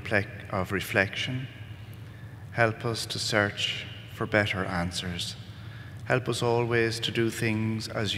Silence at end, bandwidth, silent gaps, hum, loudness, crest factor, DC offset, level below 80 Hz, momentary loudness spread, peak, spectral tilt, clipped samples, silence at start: 0 s; 16 kHz; none; none; -28 LUFS; 24 dB; under 0.1%; -60 dBFS; 17 LU; -6 dBFS; -4.5 dB/octave; under 0.1%; 0 s